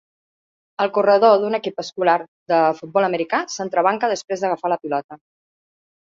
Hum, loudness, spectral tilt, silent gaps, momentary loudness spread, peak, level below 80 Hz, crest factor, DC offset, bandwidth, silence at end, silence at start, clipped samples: none; -19 LUFS; -4.5 dB/octave; 2.28-2.46 s, 5.04-5.09 s; 10 LU; -2 dBFS; -70 dBFS; 18 dB; under 0.1%; 7.6 kHz; 0.85 s; 0.8 s; under 0.1%